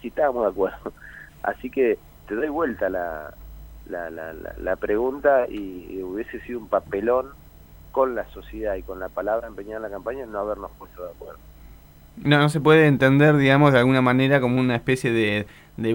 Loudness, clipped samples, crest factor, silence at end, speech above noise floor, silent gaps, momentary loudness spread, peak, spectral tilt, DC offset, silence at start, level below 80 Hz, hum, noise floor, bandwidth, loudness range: -22 LUFS; under 0.1%; 20 dB; 0 s; 25 dB; none; 20 LU; -2 dBFS; -7 dB/octave; under 0.1%; 0.05 s; -46 dBFS; none; -47 dBFS; 16.5 kHz; 11 LU